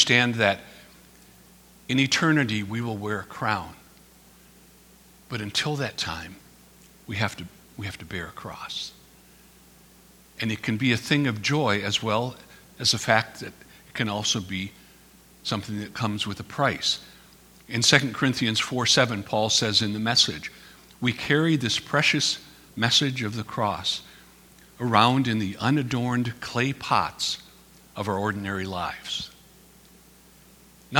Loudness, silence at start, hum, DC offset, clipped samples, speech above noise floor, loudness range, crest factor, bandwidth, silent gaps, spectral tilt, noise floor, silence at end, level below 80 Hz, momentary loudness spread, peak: -24 LUFS; 0 s; none; under 0.1%; under 0.1%; 28 dB; 10 LU; 26 dB; over 20 kHz; none; -3.5 dB/octave; -53 dBFS; 0 s; -58 dBFS; 15 LU; 0 dBFS